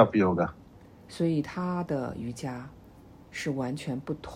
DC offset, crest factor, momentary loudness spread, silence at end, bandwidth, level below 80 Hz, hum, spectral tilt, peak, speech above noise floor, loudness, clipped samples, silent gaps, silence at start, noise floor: under 0.1%; 24 dB; 14 LU; 0 s; 15.5 kHz; -58 dBFS; none; -7 dB/octave; -6 dBFS; 23 dB; -30 LUFS; under 0.1%; none; 0 s; -52 dBFS